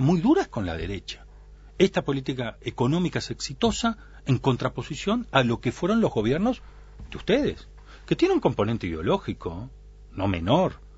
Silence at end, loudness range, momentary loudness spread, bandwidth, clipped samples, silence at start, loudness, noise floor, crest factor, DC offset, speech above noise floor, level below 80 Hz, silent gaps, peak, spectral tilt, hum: 0 s; 2 LU; 13 LU; 8 kHz; under 0.1%; 0 s; -26 LUFS; -47 dBFS; 22 dB; under 0.1%; 22 dB; -44 dBFS; none; -2 dBFS; -6 dB/octave; none